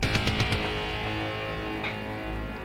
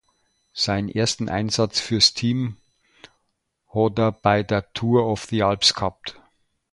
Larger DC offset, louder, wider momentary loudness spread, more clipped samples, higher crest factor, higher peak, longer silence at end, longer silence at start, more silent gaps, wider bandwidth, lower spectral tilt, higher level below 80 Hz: neither; second, -30 LUFS vs -21 LUFS; second, 8 LU vs 12 LU; neither; about the same, 18 dB vs 20 dB; second, -12 dBFS vs -4 dBFS; second, 0 s vs 0.6 s; second, 0 s vs 0.55 s; neither; first, 16 kHz vs 11.5 kHz; about the same, -5 dB/octave vs -4.5 dB/octave; first, -40 dBFS vs -50 dBFS